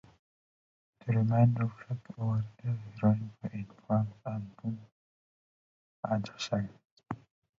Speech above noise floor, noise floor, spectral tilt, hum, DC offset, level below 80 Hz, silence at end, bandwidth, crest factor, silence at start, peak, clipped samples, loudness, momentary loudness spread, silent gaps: over 59 dB; under -90 dBFS; -8 dB/octave; none; under 0.1%; -64 dBFS; 0.45 s; 7.6 kHz; 20 dB; 1.05 s; -14 dBFS; under 0.1%; -33 LUFS; 17 LU; 4.92-6.03 s, 6.85-6.97 s